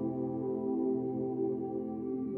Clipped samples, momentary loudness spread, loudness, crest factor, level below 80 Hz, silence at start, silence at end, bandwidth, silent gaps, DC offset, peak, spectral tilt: under 0.1%; 5 LU; -35 LUFS; 12 dB; -72 dBFS; 0 s; 0 s; 2.4 kHz; none; under 0.1%; -22 dBFS; -13 dB/octave